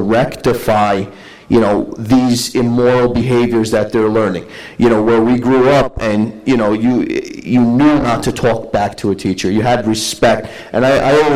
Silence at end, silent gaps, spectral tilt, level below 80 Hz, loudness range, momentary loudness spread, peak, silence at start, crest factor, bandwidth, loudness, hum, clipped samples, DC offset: 0 s; none; -6 dB/octave; -38 dBFS; 1 LU; 7 LU; -2 dBFS; 0 s; 12 dB; 15.5 kHz; -13 LUFS; none; under 0.1%; under 0.1%